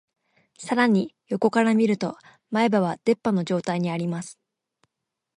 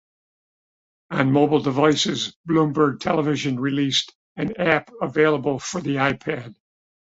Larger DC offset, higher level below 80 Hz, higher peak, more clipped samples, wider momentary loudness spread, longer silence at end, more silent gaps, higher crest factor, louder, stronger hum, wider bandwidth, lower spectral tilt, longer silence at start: neither; second, -70 dBFS vs -58 dBFS; second, -6 dBFS vs -2 dBFS; neither; about the same, 12 LU vs 10 LU; first, 1.05 s vs 0.65 s; second, none vs 2.36-2.44 s, 4.15-4.35 s; about the same, 18 dB vs 20 dB; second, -24 LUFS vs -21 LUFS; neither; first, 11 kHz vs 8 kHz; first, -6.5 dB/octave vs -5 dB/octave; second, 0.6 s vs 1.1 s